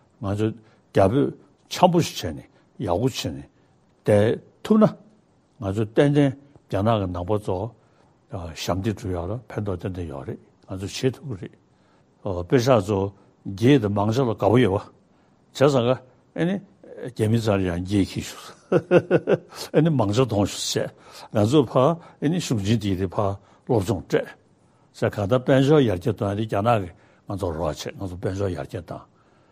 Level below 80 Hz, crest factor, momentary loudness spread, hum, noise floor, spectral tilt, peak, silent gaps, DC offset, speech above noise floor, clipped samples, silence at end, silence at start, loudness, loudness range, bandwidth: -52 dBFS; 22 dB; 16 LU; none; -59 dBFS; -6.5 dB/octave; 0 dBFS; none; under 0.1%; 37 dB; under 0.1%; 0.5 s; 0.2 s; -23 LUFS; 7 LU; 15.5 kHz